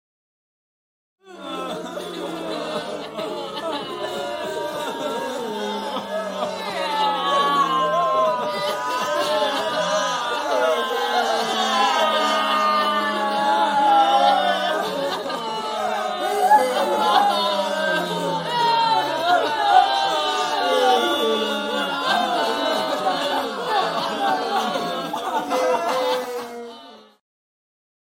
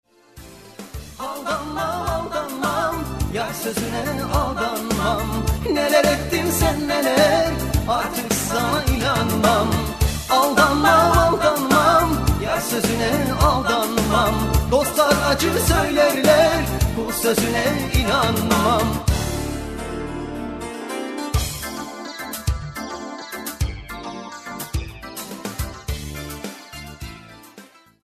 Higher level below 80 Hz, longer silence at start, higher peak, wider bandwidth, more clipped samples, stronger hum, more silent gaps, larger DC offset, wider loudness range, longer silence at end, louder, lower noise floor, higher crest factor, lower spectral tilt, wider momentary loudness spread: second, -66 dBFS vs -30 dBFS; first, 1.25 s vs 0.35 s; about the same, -2 dBFS vs -4 dBFS; first, 16.5 kHz vs 14 kHz; neither; neither; neither; neither; second, 9 LU vs 13 LU; first, 1.1 s vs 0.4 s; about the same, -21 LUFS vs -20 LUFS; about the same, -44 dBFS vs -47 dBFS; about the same, 20 dB vs 16 dB; second, -3 dB/octave vs -4.5 dB/octave; second, 11 LU vs 16 LU